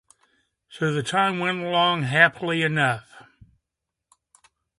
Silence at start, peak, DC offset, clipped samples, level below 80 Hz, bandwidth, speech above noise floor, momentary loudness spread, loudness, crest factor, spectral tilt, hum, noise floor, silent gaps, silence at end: 0.7 s; -2 dBFS; under 0.1%; under 0.1%; -66 dBFS; 11.5 kHz; 62 dB; 8 LU; -22 LUFS; 24 dB; -5 dB/octave; none; -84 dBFS; none; 1.55 s